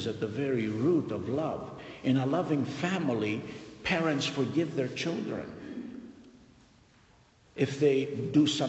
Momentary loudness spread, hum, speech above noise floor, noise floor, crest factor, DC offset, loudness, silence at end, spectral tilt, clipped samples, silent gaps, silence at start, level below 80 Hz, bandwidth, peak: 15 LU; none; 32 dB; -61 dBFS; 18 dB; under 0.1%; -30 LUFS; 0 s; -6 dB/octave; under 0.1%; none; 0 s; -64 dBFS; 8.4 kHz; -14 dBFS